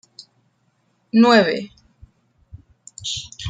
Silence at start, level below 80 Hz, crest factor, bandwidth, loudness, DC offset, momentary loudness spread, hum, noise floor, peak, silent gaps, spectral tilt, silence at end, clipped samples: 1.15 s; -52 dBFS; 20 dB; 9.4 kHz; -18 LUFS; under 0.1%; 17 LU; none; -65 dBFS; -2 dBFS; none; -4.5 dB/octave; 0 s; under 0.1%